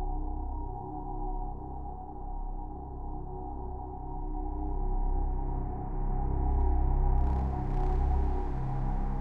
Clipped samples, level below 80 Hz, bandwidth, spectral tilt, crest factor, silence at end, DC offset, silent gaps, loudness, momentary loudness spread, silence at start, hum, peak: under 0.1%; -32 dBFS; 2.5 kHz; -10.5 dB/octave; 14 dB; 0 s; 0.3%; none; -35 LUFS; 11 LU; 0 s; none; -16 dBFS